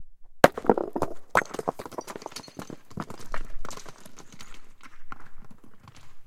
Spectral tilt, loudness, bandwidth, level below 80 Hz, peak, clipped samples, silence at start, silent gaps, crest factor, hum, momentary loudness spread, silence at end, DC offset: -4.5 dB/octave; -28 LUFS; 16.5 kHz; -44 dBFS; 0 dBFS; under 0.1%; 0 s; none; 28 dB; none; 25 LU; 0 s; under 0.1%